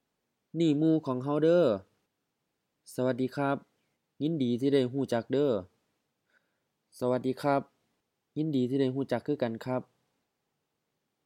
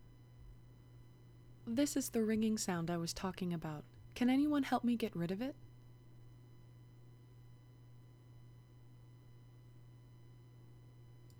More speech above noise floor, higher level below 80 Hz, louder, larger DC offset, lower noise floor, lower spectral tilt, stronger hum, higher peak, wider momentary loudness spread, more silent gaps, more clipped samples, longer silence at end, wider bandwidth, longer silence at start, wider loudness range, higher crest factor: first, 54 dB vs 23 dB; second, -80 dBFS vs -66 dBFS; first, -30 LUFS vs -38 LUFS; neither; first, -82 dBFS vs -59 dBFS; first, -7.5 dB/octave vs -5 dB/octave; neither; first, -14 dBFS vs -22 dBFS; second, 10 LU vs 26 LU; neither; neither; first, 1.45 s vs 0 s; second, 14.5 kHz vs over 20 kHz; first, 0.55 s vs 0 s; second, 4 LU vs 23 LU; about the same, 18 dB vs 20 dB